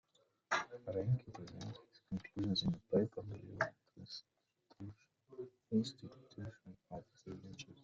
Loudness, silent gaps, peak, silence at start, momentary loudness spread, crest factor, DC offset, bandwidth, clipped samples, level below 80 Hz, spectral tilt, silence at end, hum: -42 LUFS; none; -22 dBFS; 0.5 s; 18 LU; 22 dB; under 0.1%; 8 kHz; under 0.1%; -70 dBFS; -6 dB/octave; 0.1 s; none